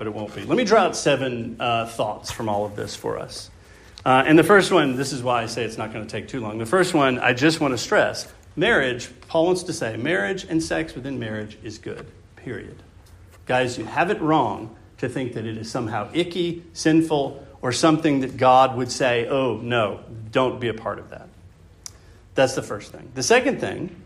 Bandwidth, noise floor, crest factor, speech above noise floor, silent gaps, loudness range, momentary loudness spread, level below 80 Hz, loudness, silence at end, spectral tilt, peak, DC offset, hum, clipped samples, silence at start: 15 kHz; -48 dBFS; 20 dB; 26 dB; none; 7 LU; 17 LU; -52 dBFS; -22 LUFS; 0 s; -4.5 dB/octave; -2 dBFS; under 0.1%; none; under 0.1%; 0 s